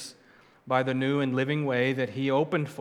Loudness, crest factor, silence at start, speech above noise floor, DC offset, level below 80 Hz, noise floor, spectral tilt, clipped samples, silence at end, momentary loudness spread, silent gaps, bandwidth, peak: -27 LUFS; 18 dB; 0 s; 31 dB; under 0.1%; -76 dBFS; -58 dBFS; -6.5 dB/octave; under 0.1%; 0 s; 3 LU; none; 13 kHz; -10 dBFS